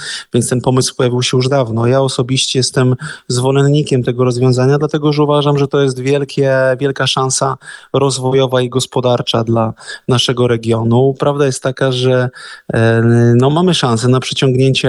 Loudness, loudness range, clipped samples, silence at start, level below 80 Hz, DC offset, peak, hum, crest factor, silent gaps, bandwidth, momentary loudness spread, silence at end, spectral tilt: -13 LUFS; 2 LU; under 0.1%; 0 s; -48 dBFS; under 0.1%; 0 dBFS; none; 12 dB; none; 12.5 kHz; 5 LU; 0 s; -5.5 dB/octave